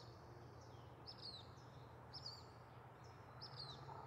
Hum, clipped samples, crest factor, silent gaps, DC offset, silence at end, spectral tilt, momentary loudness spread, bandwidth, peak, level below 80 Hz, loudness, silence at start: none; under 0.1%; 18 dB; none; under 0.1%; 0 s; -5 dB/octave; 7 LU; 15.5 kHz; -40 dBFS; -76 dBFS; -56 LUFS; 0 s